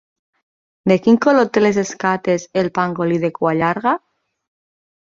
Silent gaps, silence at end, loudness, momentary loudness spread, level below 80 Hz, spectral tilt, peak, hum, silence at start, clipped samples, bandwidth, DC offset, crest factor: none; 1.1 s; -17 LUFS; 7 LU; -58 dBFS; -6 dB/octave; -2 dBFS; none; 0.85 s; under 0.1%; 7.6 kHz; under 0.1%; 16 dB